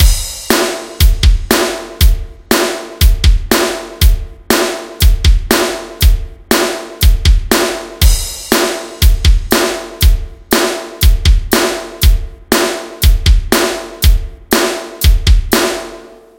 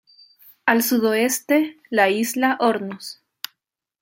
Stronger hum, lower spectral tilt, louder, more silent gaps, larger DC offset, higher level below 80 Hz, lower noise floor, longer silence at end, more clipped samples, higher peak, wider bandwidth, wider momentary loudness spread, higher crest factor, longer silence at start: neither; about the same, -4 dB/octave vs -3 dB/octave; first, -13 LUFS vs -20 LUFS; neither; first, 0.1% vs under 0.1%; first, -14 dBFS vs -74 dBFS; second, -34 dBFS vs -78 dBFS; second, 0.3 s vs 0.9 s; first, 0.4% vs under 0.1%; about the same, 0 dBFS vs -2 dBFS; about the same, 17.5 kHz vs 17 kHz; second, 6 LU vs 17 LU; second, 12 dB vs 20 dB; second, 0 s vs 0.65 s